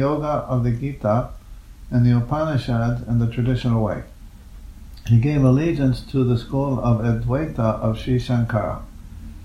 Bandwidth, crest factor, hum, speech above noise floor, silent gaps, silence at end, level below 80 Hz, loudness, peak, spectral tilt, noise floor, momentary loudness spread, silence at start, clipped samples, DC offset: 9.8 kHz; 16 dB; none; 20 dB; none; 0 s; -36 dBFS; -21 LUFS; -4 dBFS; -9 dB/octave; -40 dBFS; 11 LU; 0 s; under 0.1%; under 0.1%